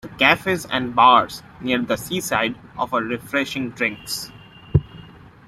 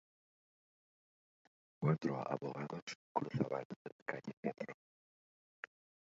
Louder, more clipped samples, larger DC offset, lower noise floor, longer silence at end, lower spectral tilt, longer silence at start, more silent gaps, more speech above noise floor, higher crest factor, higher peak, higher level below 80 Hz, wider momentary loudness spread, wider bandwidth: first, -20 LUFS vs -42 LUFS; neither; neither; second, -43 dBFS vs under -90 dBFS; second, 0.35 s vs 1.4 s; second, -4.5 dB/octave vs -6.5 dB/octave; second, 0.05 s vs 1.8 s; second, none vs 2.82-2.87 s, 2.95-3.15 s, 3.65-3.70 s, 3.76-3.85 s, 3.92-4.06 s, 4.33-4.43 s; second, 23 dB vs over 49 dB; about the same, 20 dB vs 24 dB; first, 0 dBFS vs -20 dBFS; first, -46 dBFS vs -80 dBFS; second, 14 LU vs 17 LU; first, 16 kHz vs 7.4 kHz